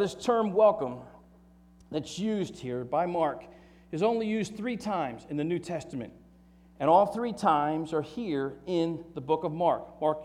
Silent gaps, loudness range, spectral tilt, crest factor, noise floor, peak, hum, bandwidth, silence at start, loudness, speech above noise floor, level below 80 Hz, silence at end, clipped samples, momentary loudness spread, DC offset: none; 4 LU; -6.5 dB/octave; 20 dB; -57 dBFS; -10 dBFS; none; 12.5 kHz; 0 s; -29 LUFS; 28 dB; -62 dBFS; 0 s; under 0.1%; 13 LU; under 0.1%